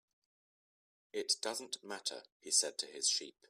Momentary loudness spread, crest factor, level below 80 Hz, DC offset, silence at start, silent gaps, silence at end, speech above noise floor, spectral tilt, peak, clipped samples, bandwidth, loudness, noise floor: 12 LU; 24 dB; under -90 dBFS; under 0.1%; 1.15 s; 2.32-2.40 s; 0.2 s; over 51 dB; 1 dB/octave; -18 dBFS; under 0.1%; 15.5 kHz; -36 LUFS; under -90 dBFS